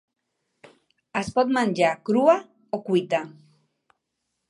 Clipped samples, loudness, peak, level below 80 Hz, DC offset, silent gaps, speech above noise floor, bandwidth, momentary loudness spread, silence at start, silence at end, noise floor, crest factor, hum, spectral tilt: under 0.1%; -23 LUFS; -6 dBFS; -64 dBFS; under 0.1%; none; 57 dB; 11.5 kHz; 13 LU; 1.15 s; 1.2 s; -79 dBFS; 20 dB; none; -6 dB/octave